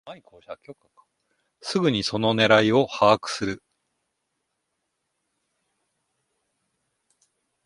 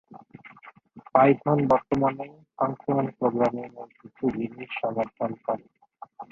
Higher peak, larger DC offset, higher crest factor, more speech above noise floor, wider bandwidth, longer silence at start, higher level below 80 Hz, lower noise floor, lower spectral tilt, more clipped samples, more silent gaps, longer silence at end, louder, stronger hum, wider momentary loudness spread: about the same, -2 dBFS vs -4 dBFS; neither; about the same, 24 dB vs 22 dB; first, 56 dB vs 26 dB; first, 11.5 kHz vs 7.2 kHz; about the same, 0.05 s vs 0.1 s; about the same, -62 dBFS vs -62 dBFS; first, -78 dBFS vs -51 dBFS; second, -5 dB/octave vs -9 dB/octave; neither; neither; first, 4.1 s vs 0.1 s; first, -21 LUFS vs -26 LUFS; neither; first, 24 LU vs 21 LU